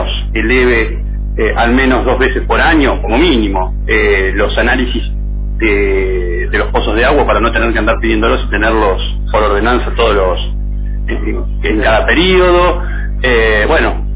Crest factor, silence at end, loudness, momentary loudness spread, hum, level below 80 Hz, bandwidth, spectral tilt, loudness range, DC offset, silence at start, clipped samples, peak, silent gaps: 12 dB; 0 s; -12 LUFS; 9 LU; 50 Hz at -15 dBFS; -16 dBFS; 4 kHz; -9.5 dB/octave; 2 LU; under 0.1%; 0 s; under 0.1%; 0 dBFS; none